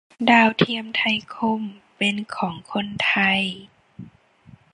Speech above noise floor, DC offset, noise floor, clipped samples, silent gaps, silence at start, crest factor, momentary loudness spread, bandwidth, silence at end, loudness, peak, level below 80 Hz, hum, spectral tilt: 30 dB; under 0.1%; -51 dBFS; under 0.1%; none; 0.2 s; 22 dB; 13 LU; 10.5 kHz; 0.7 s; -21 LUFS; -2 dBFS; -62 dBFS; none; -5 dB/octave